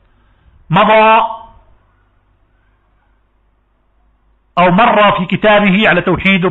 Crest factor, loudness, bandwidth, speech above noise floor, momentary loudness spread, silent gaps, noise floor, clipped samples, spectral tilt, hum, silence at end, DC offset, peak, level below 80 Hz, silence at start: 12 dB; -10 LUFS; 7.2 kHz; 47 dB; 8 LU; none; -56 dBFS; under 0.1%; -3.5 dB/octave; none; 0 s; under 0.1%; 0 dBFS; -42 dBFS; 0.7 s